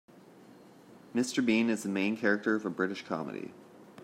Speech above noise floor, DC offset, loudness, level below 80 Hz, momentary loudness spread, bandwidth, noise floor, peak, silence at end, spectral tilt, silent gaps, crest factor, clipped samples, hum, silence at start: 24 dB; under 0.1%; -31 LUFS; -76 dBFS; 11 LU; 15 kHz; -55 dBFS; -14 dBFS; 0 s; -5 dB/octave; none; 20 dB; under 0.1%; none; 0.35 s